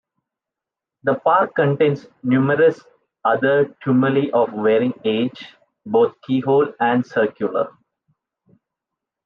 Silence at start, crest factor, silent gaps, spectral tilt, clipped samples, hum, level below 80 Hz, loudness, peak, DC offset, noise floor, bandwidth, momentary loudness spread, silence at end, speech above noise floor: 1.05 s; 16 dB; none; -8.5 dB/octave; under 0.1%; none; -70 dBFS; -19 LUFS; -4 dBFS; under 0.1%; -86 dBFS; 6.6 kHz; 8 LU; 1.55 s; 68 dB